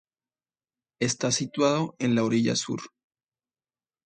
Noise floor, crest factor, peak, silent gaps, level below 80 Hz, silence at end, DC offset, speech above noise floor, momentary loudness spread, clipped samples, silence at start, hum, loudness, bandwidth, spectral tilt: under -90 dBFS; 20 dB; -10 dBFS; none; -68 dBFS; 1.2 s; under 0.1%; over 65 dB; 10 LU; under 0.1%; 1 s; none; -26 LUFS; 9.4 kHz; -4.5 dB/octave